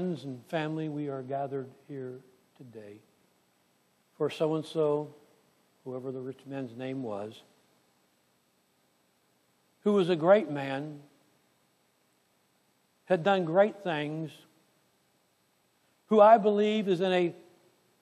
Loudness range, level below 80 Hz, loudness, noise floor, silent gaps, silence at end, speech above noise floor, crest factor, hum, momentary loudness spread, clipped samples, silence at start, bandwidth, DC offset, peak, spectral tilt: 14 LU; -86 dBFS; -29 LUFS; -71 dBFS; none; 0.6 s; 43 dB; 22 dB; none; 20 LU; under 0.1%; 0 s; 12 kHz; under 0.1%; -8 dBFS; -7 dB/octave